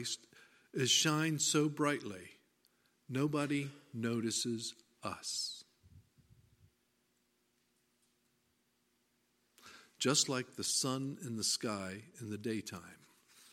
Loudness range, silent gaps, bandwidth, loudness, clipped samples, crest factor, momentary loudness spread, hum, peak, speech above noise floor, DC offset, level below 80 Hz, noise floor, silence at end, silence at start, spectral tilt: 11 LU; none; 16.5 kHz; -35 LUFS; under 0.1%; 24 dB; 16 LU; none; -16 dBFS; 41 dB; under 0.1%; -80 dBFS; -78 dBFS; 0.55 s; 0 s; -3 dB/octave